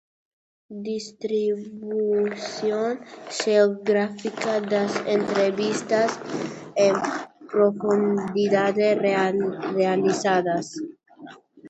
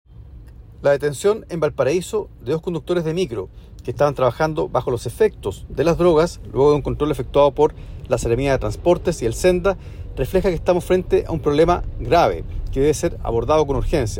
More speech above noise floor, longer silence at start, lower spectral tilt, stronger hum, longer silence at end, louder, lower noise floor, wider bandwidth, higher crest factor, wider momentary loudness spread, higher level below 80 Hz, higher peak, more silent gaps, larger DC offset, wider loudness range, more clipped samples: about the same, 23 dB vs 21 dB; first, 0.7 s vs 0.1 s; about the same, -5 dB/octave vs -6 dB/octave; neither; about the same, 0 s vs 0 s; second, -23 LUFS vs -20 LUFS; first, -45 dBFS vs -40 dBFS; second, 8.2 kHz vs 16.5 kHz; about the same, 18 dB vs 16 dB; about the same, 11 LU vs 9 LU; second, -70 dBFS vs -32 dBFS; about the same, -6 dBFS vs -4 dBFS; neither; neither; about the same, 3 LU vs 3 LU; neither